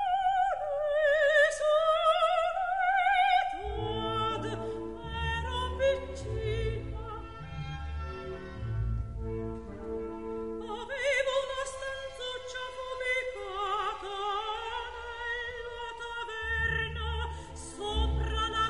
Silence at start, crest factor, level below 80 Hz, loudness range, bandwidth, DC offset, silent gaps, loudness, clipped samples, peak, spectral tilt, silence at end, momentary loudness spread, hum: 0 s; 18 dB; -42 dBFS; 11 LU; 11.5 kHz; 0.2%; none; -31 LUFS; under 0.1%; -14 dBFS; -4.5 dB/octave; 0 s; 14 LU; none